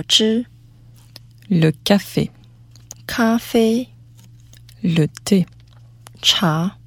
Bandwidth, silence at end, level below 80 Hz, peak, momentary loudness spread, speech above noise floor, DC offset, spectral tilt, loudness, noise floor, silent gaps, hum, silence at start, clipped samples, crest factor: 18 kHz; 0.15 s; -50 dBFS; 0 dBFS; 13 LU; 28 dB; under 0.1%; -4.5 dB/octave; -18 LUFS; -45 dBFS; none; none; 0 s; under 0.1%; 20 dB